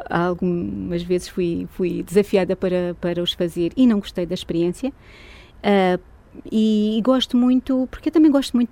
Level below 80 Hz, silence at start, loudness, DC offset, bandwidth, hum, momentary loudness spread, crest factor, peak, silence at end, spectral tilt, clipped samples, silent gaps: -46 dBFS; 0 s; -20 LUFS; under 0.1%; 16 kHz; none; 8 LU; 16 dB; -4 dBFS; 0.05 s; -6.5 dB/octave; under 0.1%; none